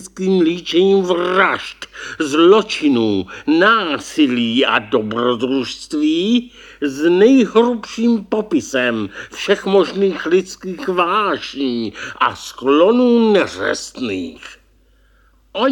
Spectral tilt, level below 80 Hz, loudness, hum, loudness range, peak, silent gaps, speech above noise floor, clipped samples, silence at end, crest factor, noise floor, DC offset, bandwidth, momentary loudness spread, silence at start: -5 dB/octave; -54 dBFS; -16 LUFS; none; 3 LU; 0 dBFS; none; 37 dB; under 0.1%; 0 s; 16 dB; -53 dBFS; under 0.1%; 16.5 kHz; 12 LU; 0 s